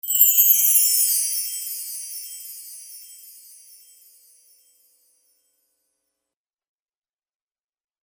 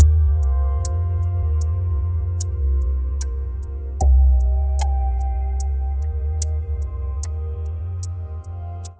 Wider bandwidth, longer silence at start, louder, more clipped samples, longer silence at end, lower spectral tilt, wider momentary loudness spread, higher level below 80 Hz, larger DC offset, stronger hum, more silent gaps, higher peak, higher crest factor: first, over 20 kHz vs 8 kHz; about the same, 0.05 s vs 0 s; first, -16 LUFS vs -23 LUFS; neither; first, 4.75 s vs 0.05 s; second, 9.5 dB/octave vs -6.5 dB/octave; first, 24 LU vs 11 LU; second, under -90 dBFS vs -20 dBFS; neither; neither; neither; about the same, -2 dBFS vs -2 dBFS; first, 24 dB vs 16 dB